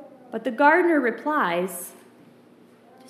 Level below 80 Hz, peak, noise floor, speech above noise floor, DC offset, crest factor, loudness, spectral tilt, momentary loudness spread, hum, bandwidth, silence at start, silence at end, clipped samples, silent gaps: -90 dBFS; -4 dBFS; -53 dBFS; 31 dB; under 0.1%; 22 dB; -22 LUFS; -4.5 dB/octave; 18 LU; none; 15.5 kHz; 0 s; 1.2 s; under 0.1%; none